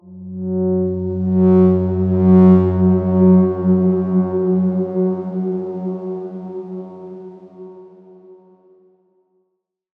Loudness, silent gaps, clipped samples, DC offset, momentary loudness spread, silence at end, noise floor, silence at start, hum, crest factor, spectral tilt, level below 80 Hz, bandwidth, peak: -16 LUFS; none; under 0.1%; under 0.1%; 18 LU; 1.65 s; -73 dBFS; 0.05 s; none; 16 dB; -13 dB/octave; -62 dBFS; 2.4 kHz; -2 dBFS